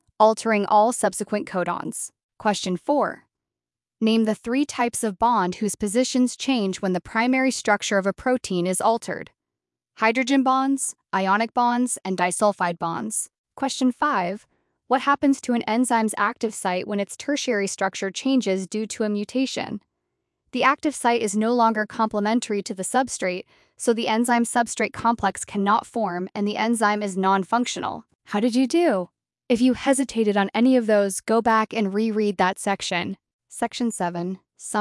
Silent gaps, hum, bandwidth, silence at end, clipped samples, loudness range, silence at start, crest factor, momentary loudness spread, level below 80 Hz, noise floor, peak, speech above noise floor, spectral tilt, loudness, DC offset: 2.23-2.29 s, 13.38-13.44 s, 28.15-28.19 s, 33.33-33.39 s; none; 12 kHz; 0 s; under 0.1%; 4 LU; 0.2 s; 18 dB; 8 LU; -62 dBFS; under -90 dBFS; -4 dBFS; over 68 dB; -4 dB/octave; -23 LUFS; under 0.1%